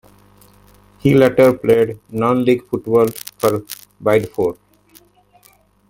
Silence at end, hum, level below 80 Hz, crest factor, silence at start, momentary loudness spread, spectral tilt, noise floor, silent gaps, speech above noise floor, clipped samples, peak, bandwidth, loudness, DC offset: 1.35 s; 50 Hz at -50 dBFS; -50 dBFS; 16 dB; 1.05 s; 9 LU; -6.5 dB/octave; -53 dBFS; none; 38 dB; under 0.1%; 0 dBFS; 17 kHz; -16 LUFS; under 0.1%